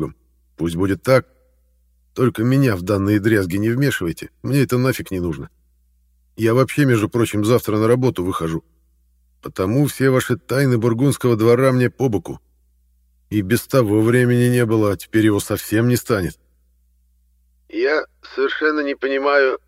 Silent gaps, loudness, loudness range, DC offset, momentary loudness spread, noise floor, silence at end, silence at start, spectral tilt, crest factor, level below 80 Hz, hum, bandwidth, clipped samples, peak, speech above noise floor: none; -18 LUFS; 4 LU; under 0.1%; 11 LU; -59 dBFS; 0.1 s; 0 s; -6.5 dB/octave; 18 dB; -48 dBFS; none; 16 kHz; under 0.1%; -2 dBFS; 41 dB